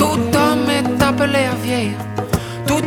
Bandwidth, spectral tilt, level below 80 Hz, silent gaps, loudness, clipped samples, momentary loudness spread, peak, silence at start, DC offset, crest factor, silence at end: 19 kHz; -5 dB/octave; -38 dBFS; none; -17 LUFS; under 0.1%; 7 LU; 0 dBFS; 0 s; under 0.1%; 16 dB; 0 s